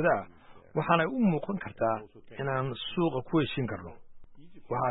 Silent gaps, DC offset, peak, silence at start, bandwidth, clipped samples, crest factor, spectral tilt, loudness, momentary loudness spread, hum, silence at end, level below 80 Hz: none; under 0.1%; -10 dBFS; 0 s; 4.1 kHz; under 0.1%; 20 dB; -10.5 dB/octave; -30 LUFS; 11 LU; none; 0 s; -58 dBFS